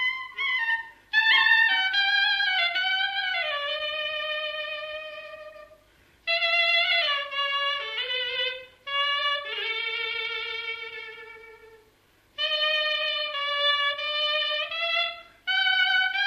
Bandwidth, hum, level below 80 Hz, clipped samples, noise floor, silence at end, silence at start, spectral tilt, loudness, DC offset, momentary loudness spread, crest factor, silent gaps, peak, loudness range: 15 kHz; none; -68 dBFS; under 0.1%; -62 dBFS; 0 s; 0 s; 0.5 dB/octave; -24 LUFS; under 0.1%; 14 LU; 18 dB; none; -10 dBFS; 7 LU